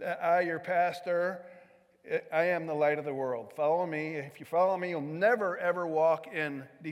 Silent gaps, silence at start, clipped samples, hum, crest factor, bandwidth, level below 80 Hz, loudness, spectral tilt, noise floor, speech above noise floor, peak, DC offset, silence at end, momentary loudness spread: none; 0 s; under 0.1%; none; 16 dB; 15 kHz; -86 dBFS; -30 LUFS; -6.5 dB/octave; -59 dBFS; 28 dB; -14 dBFS; under 0.1%; 0 s; 8 LU